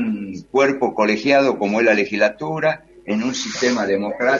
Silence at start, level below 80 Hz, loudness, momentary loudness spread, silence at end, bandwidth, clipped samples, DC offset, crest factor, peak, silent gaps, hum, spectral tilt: 0 s; -58 dBFS; -19 LUFS; 7 LU; 0 s; 7.6 kHz; under 0.1%; under 0.1%; 18 dB; 0 dBFS; none; none; -4.5 dB/octave